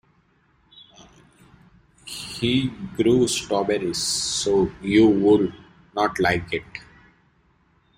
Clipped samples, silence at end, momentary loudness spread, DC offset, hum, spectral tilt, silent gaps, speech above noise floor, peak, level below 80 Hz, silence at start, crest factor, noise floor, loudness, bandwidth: under 0.1%; 1.15 s; 15 LU; under 0.1%; none; -4.5 dB/octave; none; 41 dB; -6 dBFS; -50 dBFS; 1 s; 18 dB; -62 dBFS; -21 LUFS; 16 kHz